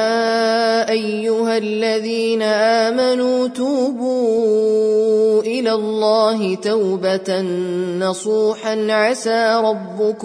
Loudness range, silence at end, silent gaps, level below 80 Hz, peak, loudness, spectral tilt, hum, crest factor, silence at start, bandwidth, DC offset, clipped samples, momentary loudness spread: 2 LU; 0 s; none; -70 dBFS; -4 dBFS; -17 LUFS; -4.5 dB/octave; none; 12 dB; 0 s; 10.5 kHz; under 0.1%; under 0.1%; 5 LU